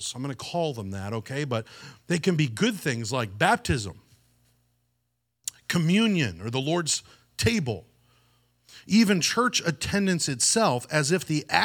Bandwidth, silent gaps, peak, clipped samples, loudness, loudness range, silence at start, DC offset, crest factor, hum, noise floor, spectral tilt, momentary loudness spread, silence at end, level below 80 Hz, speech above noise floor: 18.5 kHz; none; -4 dBFS; under 0.1%; -25 LUFS; 5 LU; 0 s; under 0.1%; 24 dB; 60 Hz at -55 dBFS; -77 dBFS; -4 dB/octave; 12 LU; 0 s; -54 dBFS; 52 dB